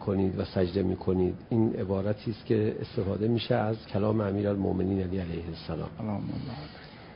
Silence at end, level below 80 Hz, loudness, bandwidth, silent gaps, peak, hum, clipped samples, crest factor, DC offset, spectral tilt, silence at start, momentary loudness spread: 0 s; -48 dBFS; -30 LUFS; 5.4 kHz; none; -12 dBFS; none; under 0.1%; 16 dB; under 0.1%; -11.5 dB/octave; 0 s; 9 LU